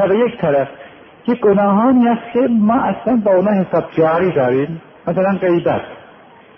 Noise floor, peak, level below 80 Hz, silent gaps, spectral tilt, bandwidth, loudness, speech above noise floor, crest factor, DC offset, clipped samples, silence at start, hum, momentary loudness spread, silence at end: -43 dBFS; -2 dBFS; -52 dBFS; none; -10.5 dB/octave; 3.6 kHz; -15 LUFS; 28 dB; 12 dB; under 0.1%; under 0.1%; 0 s; none; 10 LU; 0.6 s